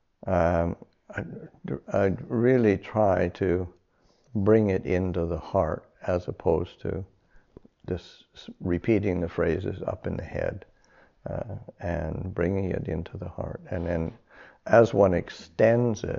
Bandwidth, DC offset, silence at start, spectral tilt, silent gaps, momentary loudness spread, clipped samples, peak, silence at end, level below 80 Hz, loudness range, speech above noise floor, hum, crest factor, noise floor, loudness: 7.2 kHz; under 0.1%; 0.25 s; -7.5 dB/octave; none; 16 LU; under 0.1%; -6 dBFS; 0 s; -48 dBFS; 7 LU; 38 dB; none; 20 dB; -64 dBFS; -27 LUFS